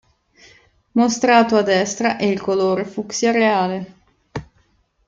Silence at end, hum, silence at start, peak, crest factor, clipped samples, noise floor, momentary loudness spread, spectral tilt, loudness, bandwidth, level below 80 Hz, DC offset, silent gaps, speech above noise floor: 0.65 s; none; 0.95 s; -2 dBFS; 18 dB; under 0.1%; -61 dBFS; 20 LU; -4.5 dB/octave; -18 LUFS; 7.8 kHz; -56 dBFS; under 0.1%; none; 44 dB